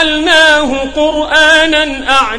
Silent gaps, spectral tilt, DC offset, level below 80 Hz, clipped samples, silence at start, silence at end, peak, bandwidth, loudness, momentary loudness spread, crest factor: none; -2 dB/octave; under 0.1%; -34 dBFS; 0.5%; 0 s; 0 s; 0 dBFS; 15.5 kHz; -8 LUFS; 7 LU; 10 dB